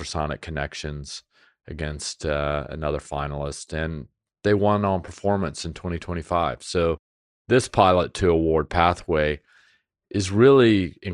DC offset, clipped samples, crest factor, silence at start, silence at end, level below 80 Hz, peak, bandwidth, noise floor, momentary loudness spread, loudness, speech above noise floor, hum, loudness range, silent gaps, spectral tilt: under 0.1%; under 0.1%; 22 dB; 0 s; 0 s; -42 dBFS; -2 dBFS; 11 kHz; -63 dBFS; 14 LU; -23 LUFS; 41 dB; none; 8 LU; 6.99-7.45 s; -5.5 dB/octave